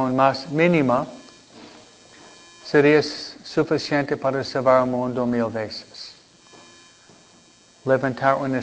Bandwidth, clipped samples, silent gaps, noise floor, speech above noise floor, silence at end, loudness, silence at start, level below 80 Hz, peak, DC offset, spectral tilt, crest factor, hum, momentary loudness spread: 8 kHz; under 0.1%; none; -53 dBFS; 32 dB; 0 s; -21 LUFS; 0 s; -60 dBFS; -4 dBFS; under 0.1%; -6 dB/octave; 20 dB; none; 16 LU